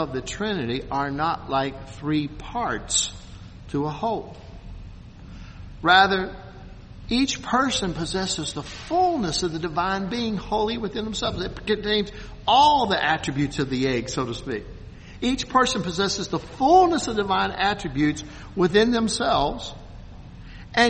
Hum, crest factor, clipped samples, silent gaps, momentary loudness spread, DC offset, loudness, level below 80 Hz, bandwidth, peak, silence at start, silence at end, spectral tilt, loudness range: none; 22 dB; under 0.1%; none; 24 LU; under 0.1%; -23 LUFS; -42 dBFS; 8.8 kHz; -2 dBFS; 0 s; 0 s; -4 dB/octave; 5 LU